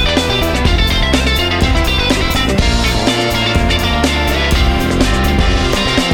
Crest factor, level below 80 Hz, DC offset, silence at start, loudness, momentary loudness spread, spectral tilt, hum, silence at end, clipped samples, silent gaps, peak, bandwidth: 12 dB; -18 dBFS; under 0.1%; 0 s; -13 LUFS; 1 LU; -4.5 dB/octave; none; 0 s; under 0.1%; none; -2 dBFS; 19 kHz